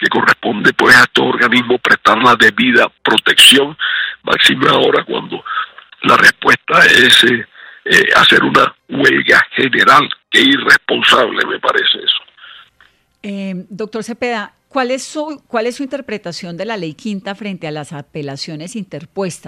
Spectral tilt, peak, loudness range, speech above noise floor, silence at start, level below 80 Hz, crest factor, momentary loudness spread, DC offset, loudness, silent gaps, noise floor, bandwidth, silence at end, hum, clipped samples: -2.5 dB/octave; 0 dBFS; 14 LU; 39 dB; 0 s; -52 dBFS; 12 dB; 18 LU; under 0.1%; -10 LUFS; none; -52 dBFS; over 20 kHz; 0 s; none; 0.1%